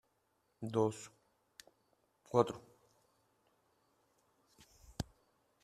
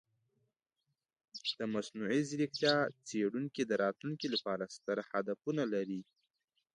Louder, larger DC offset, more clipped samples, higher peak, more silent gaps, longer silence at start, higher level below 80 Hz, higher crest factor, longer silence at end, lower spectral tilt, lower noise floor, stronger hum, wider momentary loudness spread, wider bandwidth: about the same, -38 LUFS vs -36 LUFS; neither; neither; about the same, -14 dBFS vs -16 dBFS; neither; second, 0.6 s vs 1.35 s; first, -68 dBFS vs -82 dBFS; first, 30 dB vs 22 dB; about the same, 0.6 s vs 0.7 s; first, -6.5 dB/octave vs -5 dB/octave; second, -79 dBFS vs -86 dBFS; neither; first, 26 LU vs 8 LU; first, 14 kHz vs 11 kHz